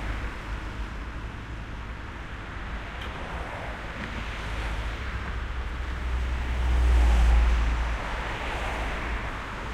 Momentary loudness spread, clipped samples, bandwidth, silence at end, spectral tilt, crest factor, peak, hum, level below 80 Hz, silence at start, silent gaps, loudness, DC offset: 15 LU; under 0.1%; 9.6 kHz; 0 s; -5.5 dB/octave; 16 dB; -12 dBFS; none; -28 dBFS; 0 s; none; -30 LUFS; under 0.1%